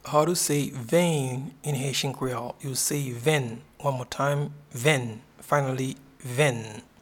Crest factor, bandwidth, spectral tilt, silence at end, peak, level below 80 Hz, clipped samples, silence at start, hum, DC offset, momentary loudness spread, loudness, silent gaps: 20 dB; 18.5 kHz; -4.5 dB/octave; 0.2 s; -6 dBFS; -62 dBFS; under 0.1%; 0.05 s; none; under 0.1%; 11 LU; -27 LUFS; none